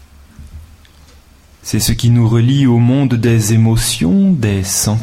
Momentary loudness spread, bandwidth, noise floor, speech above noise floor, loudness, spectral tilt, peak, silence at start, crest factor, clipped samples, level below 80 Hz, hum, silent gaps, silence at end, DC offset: 4 LU; 16.5 kHz; -44 dBFS; 32 dB; -12 LUFS; -5.5 dB/octave; -2 dBFS; 0.4 s; 12 dB; under 0.1%; -32 dBFS; none; none; 0 s; under 0.1%